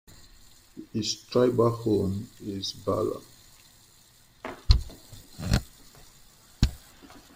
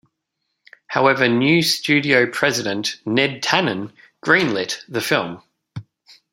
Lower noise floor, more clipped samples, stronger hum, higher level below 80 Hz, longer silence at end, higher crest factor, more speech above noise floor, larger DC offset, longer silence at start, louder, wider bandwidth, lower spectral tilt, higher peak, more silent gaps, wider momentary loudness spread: second, -57 dBFS vs -76 dBFS; neither; neither; first, -36 dBFS vs -62 dBFS; second, 0.15 s vs 0.5 s; first, 26 dB vs 20 dB; second, 31 dB vs 58 dB; neither; second, 0.75 s vs 0.9 s; second, -28 LUFS vs -18 LUFS; about the same, 16 kHz vs 16 kHz; first, -6 dB/octave vs -4 dB/octave; second, -4 dBFS vs 0 dBFS; neither; first, 24 LU vs 20 LU